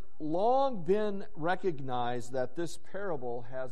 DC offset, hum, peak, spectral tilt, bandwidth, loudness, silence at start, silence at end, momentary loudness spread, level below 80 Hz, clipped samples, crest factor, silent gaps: 3%; none; -16 dBFS; -6 dB/octave; 11.5 kHz; -33 LUFS; 0.2 s; 0 s; 11 LU; -64 dBFS; under 0.1%; 16 dB; none